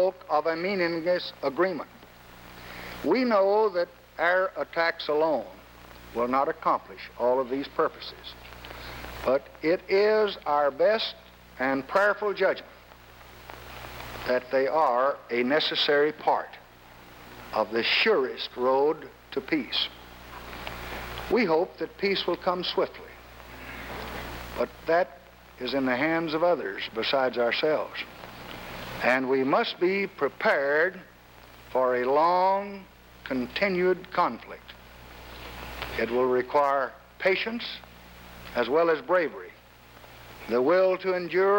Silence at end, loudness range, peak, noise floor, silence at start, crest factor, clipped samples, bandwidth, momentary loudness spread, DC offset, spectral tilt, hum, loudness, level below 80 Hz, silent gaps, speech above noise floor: 0 s; 4 LU; -8 dBFS; -52 dBFS; 0 s; 18 dB; under 0.1%; 19 kHz; 19 LU; under 0.1%; -5 dB/octave; none; -26 LUFS; -54 dBFS; none; 26 dB